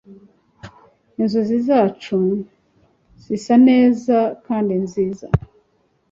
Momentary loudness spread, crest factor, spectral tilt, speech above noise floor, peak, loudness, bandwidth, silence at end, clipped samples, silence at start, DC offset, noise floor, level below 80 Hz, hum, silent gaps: 14 LU; 18 dB; -8 dB/octave; 46 dB; -2 dBFS; -18 LUFS; 7.6 kHz; 0.7 s; under 0.1%; 0.1 s; under 0.1%; -63 dBFS; -46 dBFS; none; none